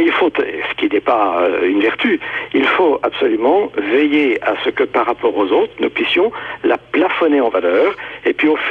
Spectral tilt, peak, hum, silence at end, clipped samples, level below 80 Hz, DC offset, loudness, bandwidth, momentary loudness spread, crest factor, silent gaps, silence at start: -6 dB/octave; -4 dBFS; none; 0 s; under 0.1%; -56 dBFS; under 0.1%; -15 LUFS; 5.8 kHz; 5 LU; 12 dB; none; 0 s